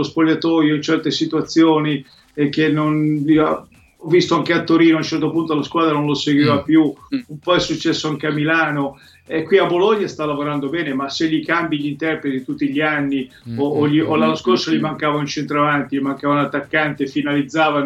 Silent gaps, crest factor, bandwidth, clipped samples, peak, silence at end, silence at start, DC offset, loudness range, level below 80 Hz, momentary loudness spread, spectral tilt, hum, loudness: none; 16 dB; 7.8 kHz; under 0.1%; -2 dBFS; 0 s; 0 s; under 0.1%; 3 LU; -56 dBFS; 8 LU; -6 dB/octave; none; -18 LUFS